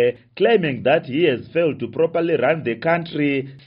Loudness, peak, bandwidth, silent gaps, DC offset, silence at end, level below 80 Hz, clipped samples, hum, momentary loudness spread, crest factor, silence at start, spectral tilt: -20 LUFS; -4 dBFS; 5.4 kHz; none; under 0.1%; 0.1 s; -62 dBFS; under 0.1%; none; 4 LU; 14 dB; 0 s; -4.5 dB/octave